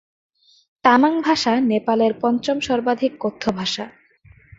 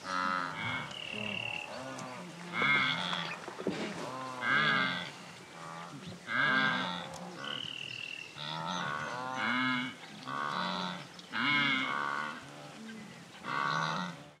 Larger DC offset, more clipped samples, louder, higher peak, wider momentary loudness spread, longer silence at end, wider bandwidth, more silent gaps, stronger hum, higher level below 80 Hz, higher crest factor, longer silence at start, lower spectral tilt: neither; neither; first, -19 LUFS vs -33 LUFS; first, -2 dBFS vs -16 dBFS; second, 9 LU vs 17 LU; first, 0.7 s vs 0.05 s; second, 7.8 kHz vs 15.5 kHz; neither; neither; first, -58 dBFS vs -78 dBFS; about the same, 18 dB vs 18 dB; first, 0.85 s vs 0 s; about the same, -4.5 dB/octave vs -3.5 dB/octave